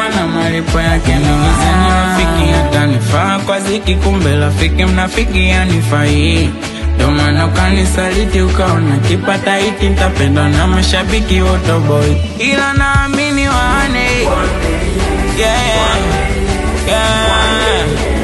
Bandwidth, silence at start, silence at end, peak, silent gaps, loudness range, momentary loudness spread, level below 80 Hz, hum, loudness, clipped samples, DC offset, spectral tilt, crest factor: 12.5 kHz; 0 s; 0 s; 0 dBFS; none; 1 LU; 3 LU; -18 dBFS; none; -12 LUFS; under 0.1%; under 0.1%; -5 dB/octave; 10 dB